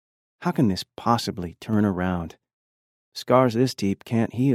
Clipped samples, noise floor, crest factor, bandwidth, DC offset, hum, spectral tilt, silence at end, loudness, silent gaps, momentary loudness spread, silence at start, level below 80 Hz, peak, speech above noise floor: under 0.1%; under -90 dBFS; 20 dB; 15.5 kHz; under 0.1%; none; -6.5 dB/octave; 0 s; -24 LUFS; 2.53-3.12 s; 13 LU; 0.4 s; -54 dBFS; -4 dBFS; over 67 dB